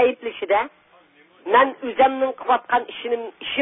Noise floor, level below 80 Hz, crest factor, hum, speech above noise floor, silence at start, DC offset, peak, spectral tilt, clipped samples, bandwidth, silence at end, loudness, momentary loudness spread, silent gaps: -54 dBFS; -62 dBFS; 18 dB; none; 34 dB; 0 s; under 0.1%; -4 dBFS; -8 dB/octave; under 0.1%; 3.9 kHz; 0 s; -21 LUFS; 10 LU; none